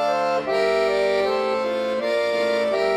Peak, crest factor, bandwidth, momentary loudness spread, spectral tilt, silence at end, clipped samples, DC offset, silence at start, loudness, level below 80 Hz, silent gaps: -10 dBFS; 12 dB; 13.5 kHz; 3 LU; -4 dB/octave; 0 s; under 0.1%; under 0.1%; 0 s; -21 LUFS; -56 dBFS; none